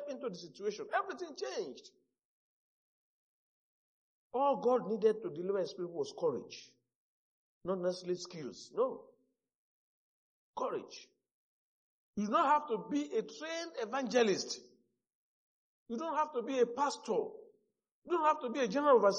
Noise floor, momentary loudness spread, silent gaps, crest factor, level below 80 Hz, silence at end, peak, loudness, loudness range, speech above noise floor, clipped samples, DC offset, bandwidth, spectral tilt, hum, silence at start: -75 dBFS; 14 LU; 2.25-4.30 s, 6.95-7.61 s, 9.54-10.53 s, 11.31-12.13 s, 15.14-15.86 s, 17.91-18.02 s; 22 dB; -84 dBFS; 0 s; -14 dBFS; -35 LUFS; 9 LU; 40 dB; under 0.1%; under 0.1%; 9 kHz; -4.5 dB/octave; none; 0 s